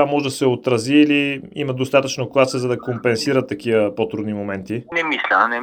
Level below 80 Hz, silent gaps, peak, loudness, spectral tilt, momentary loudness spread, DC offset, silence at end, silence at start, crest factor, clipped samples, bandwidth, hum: -60 dBFS; none; -2 dBFS; -19 LUFS; -5 dB/octave; 9 LU; under 0.1%; 0 s; 0 s; 18 dB; under 0.1%; 15.5 kHz; none